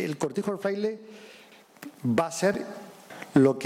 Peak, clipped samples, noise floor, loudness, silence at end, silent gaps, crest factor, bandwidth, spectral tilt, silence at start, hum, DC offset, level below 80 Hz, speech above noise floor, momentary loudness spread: -6 dBFS; under 0.1%; -50 dBFS; -27 LUFS; 0 s; none; 20 dB; 16 kHz; -6 dB/octave; 0 s; none; under 0.1%; -68 dBFS; 23 dB; 22 LU